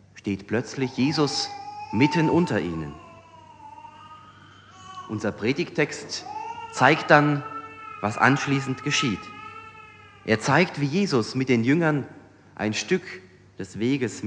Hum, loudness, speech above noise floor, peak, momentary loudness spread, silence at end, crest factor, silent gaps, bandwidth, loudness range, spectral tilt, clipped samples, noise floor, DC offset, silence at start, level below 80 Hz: none; -24 LUFS; 26 dB; 0 dBFS; 20 LU; 0 s; 24 dB; none; 9.8 kHz; 8 LU; -5 dB/octave; under 0.1%; -49 dBFS; under 0.1%; 0.15 s; -60 dBFS